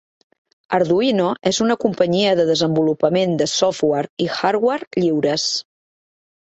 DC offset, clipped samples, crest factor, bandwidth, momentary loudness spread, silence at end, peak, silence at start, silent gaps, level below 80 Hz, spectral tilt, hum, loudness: under 0.1%; under 0.1%; 16 dB; 8.4 kHz; 4 LU; 0.9 s; -2 dBFS; 0.7 s; 4.10-4.17 s, 4.87-4.91 s; -60 dBFS; -4.5 dB/octave; none; -18 LUFS